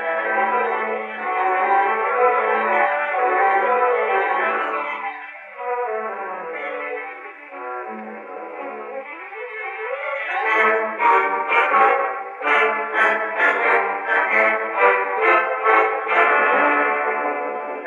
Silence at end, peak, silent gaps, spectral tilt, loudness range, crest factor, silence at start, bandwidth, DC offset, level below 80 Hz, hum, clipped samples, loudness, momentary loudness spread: 0 s; 0 dBFS; none; -4 dB/octave; 12 LU; 20 dB; 0 s; 10 kHz; under 0.1%; -88 dBFS; none; under 0.1%; -19 LUFS; 15 LU